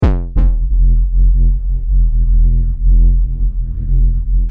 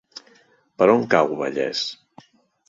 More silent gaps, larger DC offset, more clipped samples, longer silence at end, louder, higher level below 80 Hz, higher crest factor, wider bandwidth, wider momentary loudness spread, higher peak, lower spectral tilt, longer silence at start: neither; neither; neither; second, 0 s vs 0.75 s; first, -16 LUFS vs -20 LUFS; first, -10 dBFS vs -66 dBFS; second, 8 dB vs 20 dB; second, 2 kHz vs 7.8 kHz; second, 5 LU vs 18 LU; about the same, -4 dBFS vs -2 dBFS; first, -10.5 dB/octave vs -5 dB/octave; second, 0 s vs 0.8 s